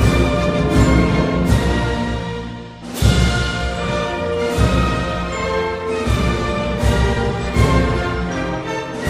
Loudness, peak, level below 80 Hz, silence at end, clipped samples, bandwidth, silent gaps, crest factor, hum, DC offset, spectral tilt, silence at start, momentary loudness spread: -18 LUFS; 0 dBFS; -24 dBFS; 0 s; under 0.1%; 15.5 kHz; none; 16 dB; none; under 0.1%; -6 dB/octave; 0 s; 7 LU